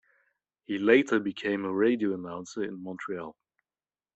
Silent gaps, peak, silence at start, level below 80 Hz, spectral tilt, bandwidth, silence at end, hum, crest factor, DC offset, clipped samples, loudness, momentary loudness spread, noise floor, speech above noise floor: none; -8 dBFS; 0.7 s; -74 dBFS; -5.5 dB/octave; 8.2 kHz; 0.85 s; none; 22 dB; under 0.1%; under 0.1%; -28 LUFS; 15 LU; under -90 dBFS; over 62 dB